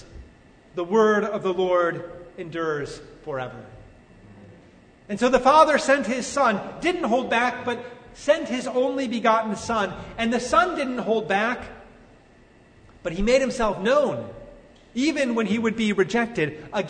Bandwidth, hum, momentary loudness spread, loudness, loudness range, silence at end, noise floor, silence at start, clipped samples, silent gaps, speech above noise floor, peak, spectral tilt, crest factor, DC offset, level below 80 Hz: 9.6 kHz; none; 15 LU; -23 LUFS; 6 LU; 0 s; -53 dBFS; 0 s; under 0.1%; none; 30 dB; -2 dBFS; -4.5 dB/octave; 20 dB; under 0.1%; -48 dBFS